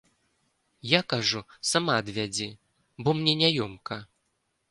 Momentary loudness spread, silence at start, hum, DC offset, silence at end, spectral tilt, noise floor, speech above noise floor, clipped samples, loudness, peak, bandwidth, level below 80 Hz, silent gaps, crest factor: 15 LU; 0.85 s; none; under 0.1%; 0.65 s; -3.5 dB/octave; -76 dBFS; 49 dB; under 0.1%; -26 LUFS; -4 dBFS; 11.5 kHz; -64 dBFS; none; 24 dB